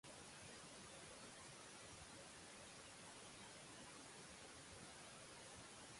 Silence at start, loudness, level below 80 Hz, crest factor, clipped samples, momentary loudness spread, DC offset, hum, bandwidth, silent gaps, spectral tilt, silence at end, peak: 0.05 s; -58 LUFS; -78 dBFS; 14 dB; under 0.1%; 1 LU; under 0.1%; none; 11.5 kHz; none; -2 dB/octave; 0 s; -46 dBFS